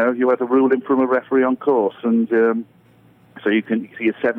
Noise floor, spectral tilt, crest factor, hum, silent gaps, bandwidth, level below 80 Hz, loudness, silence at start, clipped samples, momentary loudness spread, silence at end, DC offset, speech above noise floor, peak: -52 dBFS; -8.5 dB/octave; 12 dB; none; none; 3.8 kHz; -70 dBFS; -19 LUFS; 0 s; under 0.1%; 6 LU; 0 s; under 0.1%; 34 dB; -6 dBFS